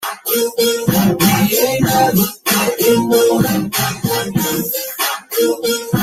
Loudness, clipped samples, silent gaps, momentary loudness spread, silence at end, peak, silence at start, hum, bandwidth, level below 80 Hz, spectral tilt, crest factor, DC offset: -15 LUFS; under 0.1%; none; 6 LU; 0 s; 0 dBFS; 0 s; none; 16.5 kHz; -46 dBFS; -4 dB/octave; 16 dB; under 0.1%